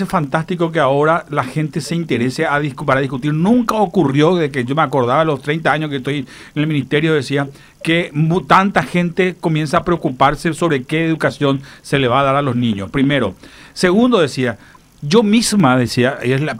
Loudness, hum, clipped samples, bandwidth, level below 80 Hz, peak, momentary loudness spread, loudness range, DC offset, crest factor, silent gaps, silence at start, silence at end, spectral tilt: -16 LUFS; none; under 0.1%; 15.5 kHz; -44 dBFS; 0 dBFS; 8 LU; 2 LU; under 0.1%; 16 dB; none; 0 s; 0 s; -6 dB/octave